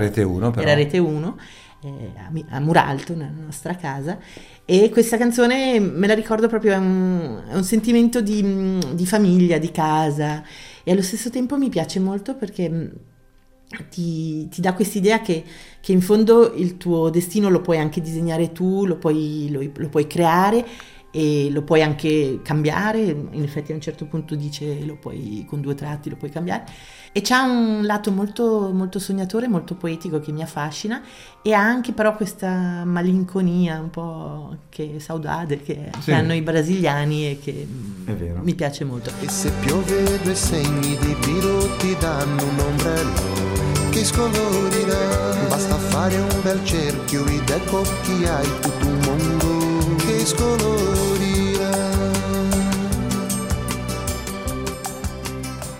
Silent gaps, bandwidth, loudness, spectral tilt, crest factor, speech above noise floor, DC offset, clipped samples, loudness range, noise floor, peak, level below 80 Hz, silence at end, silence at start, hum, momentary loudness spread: none; 16.5 kHz; -21 LUFS; -5.5 dB/octave; 20 dB; 32 dB; under 0.1%; under 0.1%; 6 LU; -52 dBFS; 0 dBFS; -36 dBFS; 0 s; 0 s; none; 12 LU